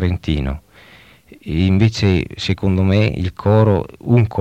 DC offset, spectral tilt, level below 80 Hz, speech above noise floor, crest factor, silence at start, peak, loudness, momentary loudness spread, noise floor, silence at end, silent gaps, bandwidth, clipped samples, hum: under 0.1%; -7.5 dB/octave; -32 dBFS; 30 dB; 16 dB; 0 s; 0 dBFS; -17 LUFS; 9 LU; -45 dBFS; 0 s; none; 8.2 kHz; under 0.1%; none